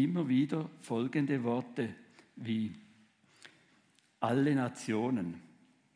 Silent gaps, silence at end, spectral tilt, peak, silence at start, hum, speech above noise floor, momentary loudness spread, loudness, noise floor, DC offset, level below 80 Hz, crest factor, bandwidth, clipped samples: none; 0.55 s; -7 dB/octave; -18 dBFS; 0 s; none; 36 dB; 12 LU; -34 LUFS; -69 dBFS; under 0.1%; -82 dBFS; 18 dB; 10.5 kHz; under 0.1%